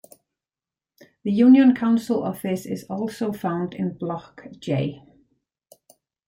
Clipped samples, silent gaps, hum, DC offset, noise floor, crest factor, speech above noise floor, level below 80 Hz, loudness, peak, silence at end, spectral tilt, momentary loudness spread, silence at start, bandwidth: under 0.1%; none; none; under 0.1%; under -90 dBFS; 18 dB; over 69 dB; -64 dBFS; -22 LUFS; -6 dBFS; 1.3 s; -7.5 dB/octave; 16 LU; 1.25 s; 16 kHz